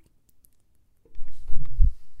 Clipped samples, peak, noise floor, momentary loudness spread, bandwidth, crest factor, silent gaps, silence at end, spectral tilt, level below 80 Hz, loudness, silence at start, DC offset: under 0.1%; -4 dBFS; -60 dBFS; 22 LU; 0.5 kHz; 16 dB; none; 0 s; -8.5 dB/octave; -26 dBFS; -30 LUFS; 1.1 s; under 0.1%